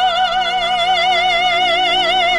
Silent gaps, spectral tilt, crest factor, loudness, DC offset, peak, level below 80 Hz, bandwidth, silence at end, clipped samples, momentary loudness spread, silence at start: none; -1.5 dB/octave; 10 dB; -14 LUFS; 0.2%; -4 dBFS; -42 dBFS; 12.5 kHz; 0 s; under 0.1%; 2 LU; 0 s